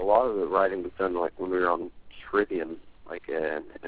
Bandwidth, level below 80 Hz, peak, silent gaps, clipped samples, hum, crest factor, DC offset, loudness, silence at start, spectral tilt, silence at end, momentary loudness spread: 4 kHz; -58 dBFS; -8 dBFS; none; under 0.1%; none; 20 dB; 0.3%; -28 LUFS; 0 s; -9 dB/octave; 0 s; 16 LU